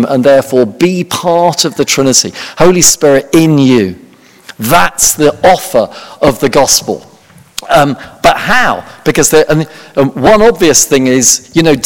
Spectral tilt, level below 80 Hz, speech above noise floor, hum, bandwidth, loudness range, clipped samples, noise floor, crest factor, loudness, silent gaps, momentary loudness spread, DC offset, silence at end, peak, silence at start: -3.5 dB/octave; -36 dBFS; 31 dB; none; over 20 kHz; 2 LU; 3%; -40 dBFS; 10 dB; -8 LUFS; none; 8 LU; under 0.1%; 0 s; 0 dBFS; 0 s